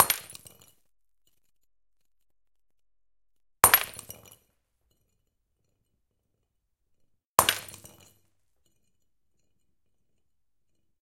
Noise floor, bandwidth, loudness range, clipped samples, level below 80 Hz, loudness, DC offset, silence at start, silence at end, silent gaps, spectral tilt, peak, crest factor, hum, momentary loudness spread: -86 dBFS; 17 kHz; 4 LU; under 0.1%; -64 dBFS; -23 LUFS; under 0.1%; 0 s; 3.35 s; 7.25-7.37 s; 0 dB/octave; 0 dBFS; 34 dB; none; 25 LU